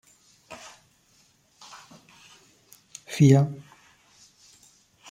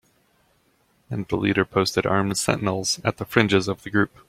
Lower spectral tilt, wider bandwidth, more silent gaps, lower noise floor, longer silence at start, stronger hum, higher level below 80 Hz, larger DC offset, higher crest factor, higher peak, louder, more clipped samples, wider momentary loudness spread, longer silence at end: first, -7 dB/octave vs -4.5 dB/octave; second, 14 kHz vs 16.5 kHz; neither; about the same, -63 dBFS vs -64 dBFS; first, 3.1 s vs 1.1 s; neither; second, -66 dBFS vs -54 dBFS; neither; about the same, 24 dB vs 22 dB; second, -6 dBFS vs -2 dBFS; about the same, -21 LUFS vs -22 LUFS; neither; first, 29 LU vs 5 LU; first, 1.55 s vs 0.2 s